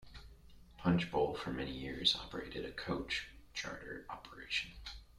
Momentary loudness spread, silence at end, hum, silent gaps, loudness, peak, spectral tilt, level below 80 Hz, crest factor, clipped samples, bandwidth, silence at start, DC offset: 16 LU; 0 s; none; none; -38 LUFS; -16 dBFS; -4.5 dB/octave; -56 dBFS; 24 dB; under 0.1%; 13.5 kHz; 0 s; under 0.1%